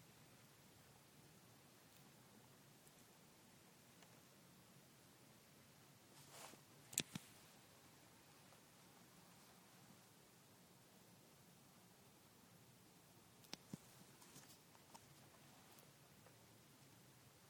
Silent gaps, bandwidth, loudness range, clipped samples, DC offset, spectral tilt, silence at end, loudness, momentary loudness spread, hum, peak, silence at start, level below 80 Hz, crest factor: none; 19 kHz; 12 LU; under 0.1%; under 0.1%; -2.5 dB/octave; 0 s; -61 LUFS; 9 LU; none; -18 dBFS; 0 s; -90 dBFS; 46 dB